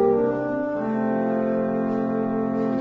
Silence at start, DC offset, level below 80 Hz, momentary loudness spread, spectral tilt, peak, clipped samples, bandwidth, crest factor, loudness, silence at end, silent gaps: 0 s; under 0.1%; -58 dBFS; 3 LU; -10 dB/octave; -8 dBFS; under 0.1%; 5.2 kHz; 14 dB; -24 LUFS; 0 s; none